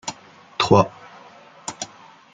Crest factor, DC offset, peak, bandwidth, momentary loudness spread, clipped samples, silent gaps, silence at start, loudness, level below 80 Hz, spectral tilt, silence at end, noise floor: 22 dB; under 0.1%; -2 dBFS; 9.4 kHz; 19 LU; under 0.1%; none; 0.05 s; -20 LUFS; -56 dBFS; -5 dB/octave; 0.5 s; -46 dBFS